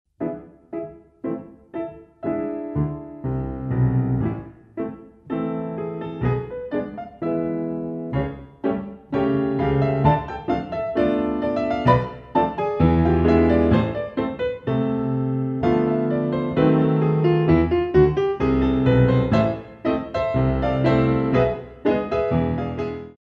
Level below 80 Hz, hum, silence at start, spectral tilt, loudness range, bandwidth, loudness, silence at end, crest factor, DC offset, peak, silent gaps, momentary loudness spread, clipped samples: -38 dBFS; none; 0.2 s; -10 dB/octave; 8 LU; 6.6 kHz; -22 LUFS; 0.1 s; 18 dB; under 0.1%; -2 dBFS; none; 13 LU; under 0.1%